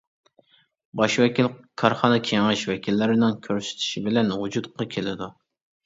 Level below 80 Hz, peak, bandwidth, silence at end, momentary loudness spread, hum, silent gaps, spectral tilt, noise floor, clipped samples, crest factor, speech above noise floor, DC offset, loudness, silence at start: -62 dBFS; -2 dBFS; 7.8 kHz; 0.55 s; 9 LU; none; none; -5 dB/octave; -61 dBFS; under 0.1%; 22 dB; 38 dB; under 0.1%; -23 LUFS; 0.95 s